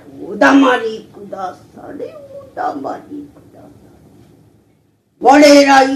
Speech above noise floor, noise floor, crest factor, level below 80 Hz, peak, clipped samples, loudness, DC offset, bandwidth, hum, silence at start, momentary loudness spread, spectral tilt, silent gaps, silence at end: 45 dB; -56 dBFS; 14 dB; -56 dBFS; 0 dBFS; 0.1%; -10 LUFS; under 0.1%; 14 kHz; none; 0.15 s; 26 LU; -3 dB/octave; none; 0 s